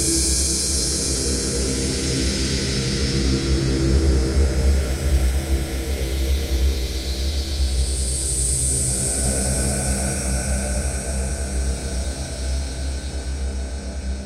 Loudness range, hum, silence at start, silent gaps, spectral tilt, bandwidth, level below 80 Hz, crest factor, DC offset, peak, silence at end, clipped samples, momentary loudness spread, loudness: 4 LU; none; 0 s; none; -4 dB/octave; 15.5 kHz; -24 dBFS; 14 dB; under 0.1%; -6 dBFS; 0 s; under 0.1%; 9 LU; -22 LUFS